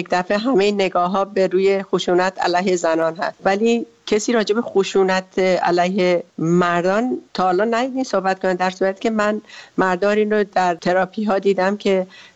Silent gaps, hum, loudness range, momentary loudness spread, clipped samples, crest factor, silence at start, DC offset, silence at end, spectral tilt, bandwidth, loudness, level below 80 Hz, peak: none; none; 1 LU; 4 LU; under 0.1%; 14 dB; 0 s; under 0.1%; 0.15 s; -5.5 dB/octave; 8.2 kHz; -19 LUFS; -58 dBFS; -4 dBFS